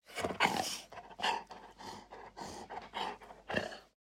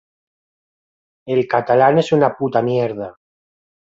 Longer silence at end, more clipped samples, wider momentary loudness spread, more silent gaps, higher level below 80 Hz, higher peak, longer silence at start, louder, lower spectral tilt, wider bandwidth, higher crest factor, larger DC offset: second, 0.15 s vs 0.9 s; neither; first, 19 LU vs 10 LU; neither; second, -68 dBFS vs -60 dBFS; second, -12 dBFS vs -2 dBFS; second, 0.05 s vs 1.25 s; second, -38 LUFS vs -17 LUFS; second, -2.5 dB/octave vs -7.5 dB/octave; first, 16 kHz vs 7.8 kHz; first, 28 dB vs 18 dB; neither